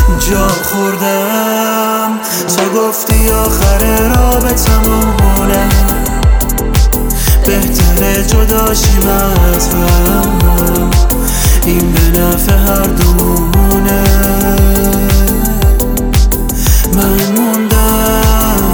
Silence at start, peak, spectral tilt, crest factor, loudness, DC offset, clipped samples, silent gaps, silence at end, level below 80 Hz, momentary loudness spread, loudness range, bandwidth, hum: 0 s; 0 dBFS; -5 dB/octave; 8 dB; -10 LUFS; under 0.1%; under 0.1%; none; 0 s; -12 dBFS; 3 LU; 1 LU; over 20 kHz; none